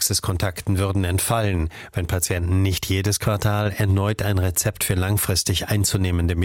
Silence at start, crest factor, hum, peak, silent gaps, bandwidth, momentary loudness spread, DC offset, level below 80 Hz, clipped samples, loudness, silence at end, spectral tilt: 0 s; 14 dB; none; -6 dBFS; none; 17 kHz; 4 LU; under 0.1%; -36 dBFS; under 0.1%; -22 LUFS; 0 s; -4.5 dB/octave